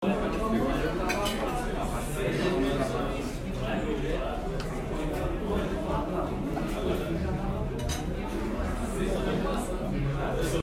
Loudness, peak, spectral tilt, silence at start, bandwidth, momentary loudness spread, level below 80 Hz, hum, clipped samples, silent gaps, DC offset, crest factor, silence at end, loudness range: -31 LUFS; -16 dBFS; -6 dB/octave; 0 s; 16 kHz; 5 LU; -36 dBFS; none; under 0.1%; none; under 0.1%; 14 dB; 0 s; 2 LU